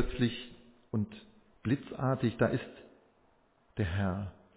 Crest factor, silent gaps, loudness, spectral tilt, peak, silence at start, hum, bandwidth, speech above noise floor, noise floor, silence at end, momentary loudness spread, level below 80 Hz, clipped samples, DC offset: 20 dB; none; -34 LUFS; -6.5 dB/octave; -14 dBFS; 0 s; none; 4 kHz; 36 dB; -68 dBFS; 0.25 s; 17 LU; -50 dBFS; under 0.1%; under 0.1%